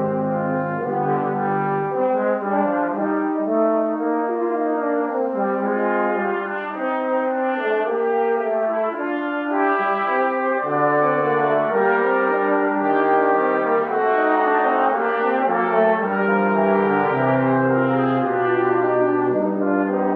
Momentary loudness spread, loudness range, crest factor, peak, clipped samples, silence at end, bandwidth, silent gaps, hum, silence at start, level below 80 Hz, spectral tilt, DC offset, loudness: 4 LU; 3 LU; 14 dB; -6 dBFS; under 0.1%; 0 s; 4.7 kHz; none; none; 0 s; -68 dBFS; -10 dB/octave; under 0.1%; -20 LUFS